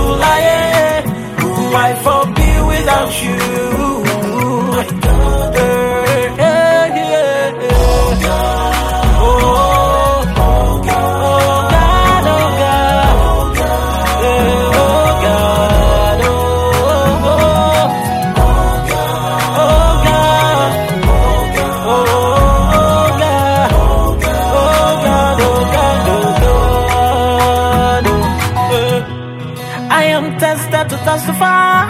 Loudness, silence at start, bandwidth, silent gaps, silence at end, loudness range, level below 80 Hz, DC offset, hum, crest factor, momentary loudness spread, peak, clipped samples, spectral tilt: -12 LUFS; 0 s; 16 kHz; none; 0 s; 2 LU; -18 dBFS; under 0.1%; none; 12 dB; 5 LU; 0 dBFS; under 0.1%; -5 dB/octave